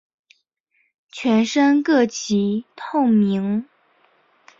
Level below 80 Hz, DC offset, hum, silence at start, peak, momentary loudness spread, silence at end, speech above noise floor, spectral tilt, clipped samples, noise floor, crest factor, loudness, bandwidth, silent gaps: -66 dBFS; under 0.1%; none; 1.15 s; -6 dBFS; 10 LU; 0.95 s; 49 dB; -5.5 dB/octave; under 0.1%; -68 dBFS; 14 dB; -19 LUFS; 7.8 kHz; none